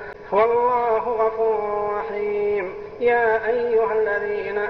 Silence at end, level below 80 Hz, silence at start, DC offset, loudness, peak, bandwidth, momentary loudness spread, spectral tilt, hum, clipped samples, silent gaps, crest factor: 0 s; -52 dBFS; 0 s; 0.2%; -21 LUFS; -8 dBFS; 5.8 kHz; 7 LU; -7 dB/octave; none; under 0.1%; none; 14 dB